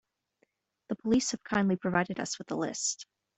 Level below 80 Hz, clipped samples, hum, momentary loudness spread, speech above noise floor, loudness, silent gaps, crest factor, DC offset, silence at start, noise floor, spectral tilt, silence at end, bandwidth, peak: -64 dBFS; under 0.1%; none; 8 LU; 44 dB; -31 LUFS; none; 22 dB; under 0.1%; 0.9 s; -74 dBFS; -4 dB/octave; 0.35 s; 8.4 kHz; -12 dBFS